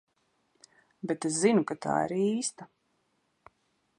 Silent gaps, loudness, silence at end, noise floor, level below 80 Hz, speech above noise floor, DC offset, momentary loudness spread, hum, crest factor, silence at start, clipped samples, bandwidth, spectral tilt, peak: none; -29 LUFS; 1.35 s; -75 dBFS; -74 dBFS; 46 dB; under 0.1%; 11 LU; none; 22 dB; 1.05 s; under 0.1%; 11.5 kHz; -4.5 dB/octave; -10 dBFS